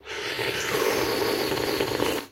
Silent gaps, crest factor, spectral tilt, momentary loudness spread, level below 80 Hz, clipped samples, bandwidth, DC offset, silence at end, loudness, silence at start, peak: none; 20 dB; -3 dB/octave; 3 LU; -52 dBFS; under 0.1%; 16 kHz; under 0.1%; 0.05 s; -25 LUFS; 0.05 s; -8 dBFS